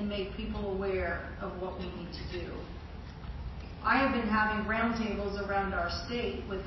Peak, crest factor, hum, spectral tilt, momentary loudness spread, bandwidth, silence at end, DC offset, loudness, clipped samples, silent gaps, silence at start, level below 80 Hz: -14 dBFS; 20 dB; none; -6.5 dB/octave; 15 LU; 6.2 kHz; 0 s; under 0.1%; -33 LUFS; under 0.1%; none; 0 s; -44 dBFS